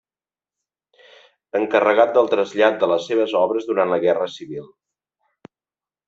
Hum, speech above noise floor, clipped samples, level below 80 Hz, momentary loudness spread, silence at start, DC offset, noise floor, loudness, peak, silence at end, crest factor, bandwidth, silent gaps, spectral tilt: none; over 72 dB; under 0.1%; -68 dBFS; 12 LU; 1.55 s; under 0.1%; under -90 dBFS; -19 LUFS; -2 dBFS; 1.45 s; 18 dB; 7.6 kHz; none; -5.5 dB/octave